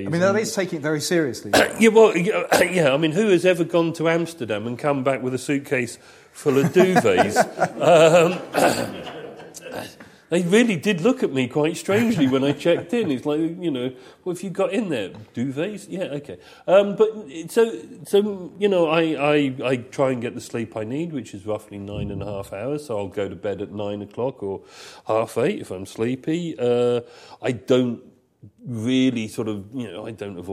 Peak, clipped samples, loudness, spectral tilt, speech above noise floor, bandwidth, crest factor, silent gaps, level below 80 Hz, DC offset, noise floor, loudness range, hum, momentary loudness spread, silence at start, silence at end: -2 dBFS; under 0.1%; -21 LUFS; -5.5 dB/octave; 19 dB; 15.5 kHz; 20 dB; none; -58 dBFS; under 0.1%; -40 dBFS; 9 LU; none; 16 LU; 0 s; 0 s